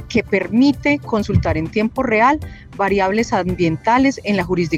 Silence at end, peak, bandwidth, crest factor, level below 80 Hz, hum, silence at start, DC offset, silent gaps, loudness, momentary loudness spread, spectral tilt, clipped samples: 0 s; -2 dBFS; 13 kHz; 14 dB; -38 dBFS; none; 0 s; under 0.1%; none; -17 LUFS; 5 LU; -6.5 dB/octave; under 0.1%